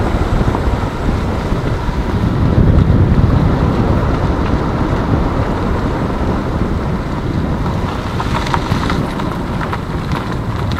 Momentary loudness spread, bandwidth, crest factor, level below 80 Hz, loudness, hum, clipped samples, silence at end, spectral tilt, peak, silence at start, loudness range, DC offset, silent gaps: 8 LU; 13.5 kHz; 14 dB; -20 dBFS; -16 LUFS; none; under 0.1%; 0 s; -7.5 dB/octave; 0 dBFS; 0 s; 4 LU; under 0.1%; none